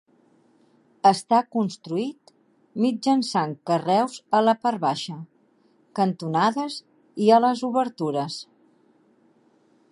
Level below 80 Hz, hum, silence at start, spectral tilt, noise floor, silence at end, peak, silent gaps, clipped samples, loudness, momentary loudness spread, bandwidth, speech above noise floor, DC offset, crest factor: -76 dBFS; none; 1.05 s; -5.5 dB/octave; -62 dBFS; 1.5 s; -4 dBFS; none; under 0.1%; -23 LUFS; 15 LU; 11.5 kHz; 39 dB; under 0.1%; 20 dB